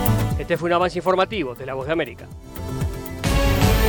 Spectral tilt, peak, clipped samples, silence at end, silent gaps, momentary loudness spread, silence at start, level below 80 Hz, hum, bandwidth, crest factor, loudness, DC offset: -5.5 dB/octave; -6 dBFS; under 0.1%; 0 s; none; 11 LU; 0 s; -28 dBFS; none; over 20 kHz; 16 dB; -22 LUFS; under 0.1%